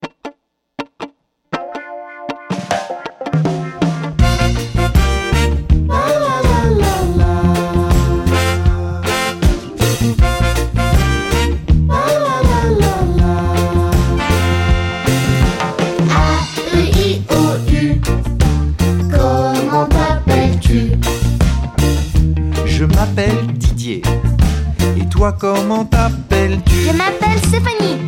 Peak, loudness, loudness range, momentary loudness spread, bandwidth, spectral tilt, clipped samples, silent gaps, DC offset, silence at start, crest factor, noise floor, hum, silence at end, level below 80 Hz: -2 dBFS; -15 LUFS; 2 LU; 6 LU; 17 kHz; -6 dB/octave; under 0.1%; none; under 0.1%; 0 s; 12 dB; -47 dBFS; none; 0 s; -18 dBFS